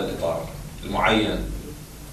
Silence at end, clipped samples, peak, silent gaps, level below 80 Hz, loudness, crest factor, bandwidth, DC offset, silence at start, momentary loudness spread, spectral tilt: 0 s; under 0.1%; -8 dBFS; none; -36 dBFS; -24 LUFS; 18 dB; 14 kHz; under 0.1%; 0 s; 17 LU; -5 dB/octave